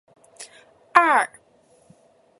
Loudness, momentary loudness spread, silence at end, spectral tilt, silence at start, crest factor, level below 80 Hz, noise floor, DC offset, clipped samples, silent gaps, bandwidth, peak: -19 LUFS; 26 LU; 1.15 s; -2 dB/octave; 0.4 s; 24 dB; -72 dBFS; -58 dBFS; under 0.1%; under 0.1%; none; 11.5 kHz; 0 dBFS